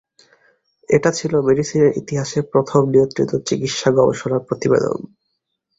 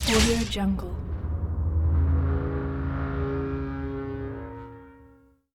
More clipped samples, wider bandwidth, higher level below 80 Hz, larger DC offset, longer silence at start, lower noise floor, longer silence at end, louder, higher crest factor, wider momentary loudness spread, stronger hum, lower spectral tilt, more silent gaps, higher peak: neither; second, 8 kHz vs 15 kHz; second, -54 dBFS vs -32 dBFS; neither; first, 0.9 s vs 0 s; first, -74 dBFS vs -56 dBFS; first, 0.75 s vs 0.5 s; first, -18 LUFS vs -28 LUFS; about the same, 18 dB vs 18 dB; second, 7 LU vs 13 LU; neither; about the same, -5.5 dB/octave vs -5 dB/octave; neither; first, -2 dBFS vs -8 dBFS